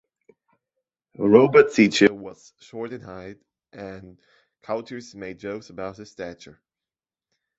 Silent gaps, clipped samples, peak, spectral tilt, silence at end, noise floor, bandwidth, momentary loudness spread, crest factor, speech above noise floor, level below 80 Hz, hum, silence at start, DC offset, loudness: none; under 0.1%; -2 dBFS; -5.5 dB/octave; 1.25 s; under -90 dBFS; 8 kHz; 24 LU; 22 dB; over 68 dB; -62 dBFS; none; 1.2 s; under 0.1%; -19 LUFS